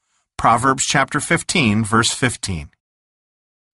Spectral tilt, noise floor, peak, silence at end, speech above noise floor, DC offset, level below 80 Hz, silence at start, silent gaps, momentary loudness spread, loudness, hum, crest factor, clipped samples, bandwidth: -3.5 dB/octave; under -90 dBFS; -2 dBFS; 1.05 s; over 72 dB; under 0.1%; -44 dBFS; 0.4 s; none; 10 LU; -17 LUFS; none; 18 dB; under 0.1%; 11.5 kHz